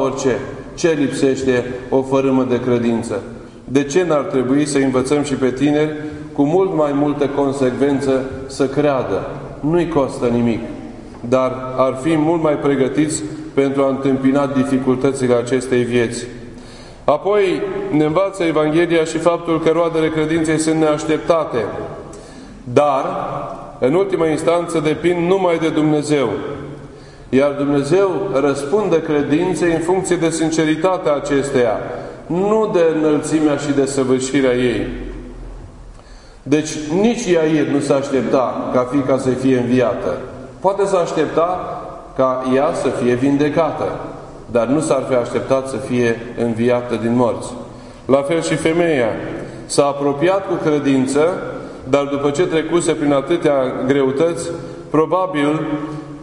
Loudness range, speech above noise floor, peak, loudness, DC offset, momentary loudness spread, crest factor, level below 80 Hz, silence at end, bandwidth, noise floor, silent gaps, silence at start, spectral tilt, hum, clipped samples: 2 LU; 23 dB; 0 dBFS; -17 LUFS; under 0.1%; 11 LU; 16 dB; -44 dBFS; 0 s; 11 kHz; -39 dBFS; none; 0 s; -6 dB/octave; none; under 0.1%